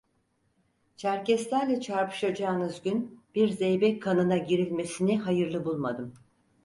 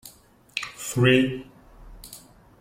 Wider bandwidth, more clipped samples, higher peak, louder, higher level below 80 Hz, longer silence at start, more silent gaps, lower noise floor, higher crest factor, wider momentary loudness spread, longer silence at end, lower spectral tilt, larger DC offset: second, 11.5 kHz vs 16.5 kHz; neither; second, -12 dBFS vs -6 dBFS; second, -28 LUFS vs -23 LUFS; second, -68 dBFS vs -52 dBFS; first, 1 s vs 0.05 s; neither; first, -72 dBFS vs -53 dBFS; second, 16 dB vs 22 dB; second, 7 LU vs 25 LU; about the same, 0.5 s vs 0.4 s; about the same, -6 dB/octave vs -5 dB/octave; neither